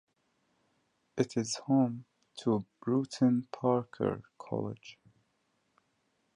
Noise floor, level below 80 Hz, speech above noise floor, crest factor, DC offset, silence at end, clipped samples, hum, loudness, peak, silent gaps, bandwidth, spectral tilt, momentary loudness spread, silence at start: -77 dBFS; -72 dBFS; 45 dB; 20 dB; under 0.1%; 1.45 s; under 0.1%; none; -32 LUFS; -14 dBFS; none; 11 kHz; -6.5 dB/octave; 16 LU; 1.15 s